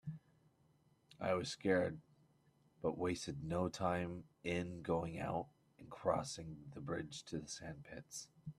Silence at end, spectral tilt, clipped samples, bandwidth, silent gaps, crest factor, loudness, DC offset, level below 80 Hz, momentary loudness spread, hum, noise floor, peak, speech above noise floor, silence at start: 0.05 s; -5.5 dB/octave; under 0.1%; 13.5 kHz; none; 22 dB; -42 LUFS; under 0.1%; -68 dBFS; 13 LU; none; -74 dBFS; -22 dBFS; 32 dB; 0.05 s